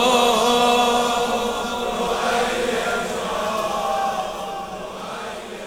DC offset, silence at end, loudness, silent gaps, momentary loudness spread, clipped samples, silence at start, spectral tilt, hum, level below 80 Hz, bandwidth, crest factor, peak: under 0.1%; 0 s; -21 LUFS; none; 14 LU; under 0.1%; 0 s; -2.5 dB/octave; none; -46 dBFS; over 20 kHz; 16 dB; -4 dBFS